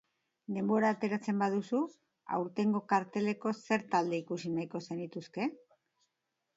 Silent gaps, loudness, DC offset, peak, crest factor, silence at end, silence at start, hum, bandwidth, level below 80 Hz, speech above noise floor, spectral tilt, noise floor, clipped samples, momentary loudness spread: none; -34 LUFS; under 0.1%; -16 dBFS; 18 dB; 1 s; 0.5 s; none; 7.8 kHz; -80 dBFS; 52 dB; -6.5 dB/octave; -85 dBFS; under 0.1%; 11 LU